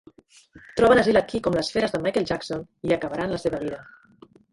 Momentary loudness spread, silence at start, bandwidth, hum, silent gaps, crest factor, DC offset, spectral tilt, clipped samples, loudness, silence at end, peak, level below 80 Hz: 14 LU; 0.55 s; 11.5 kHz; none; none; 18 dB; under 0.1%; -5.5 dB/octave; under 0.1%; -23 LUFS; 0.7 s; -6 dBFS; -50 dBFS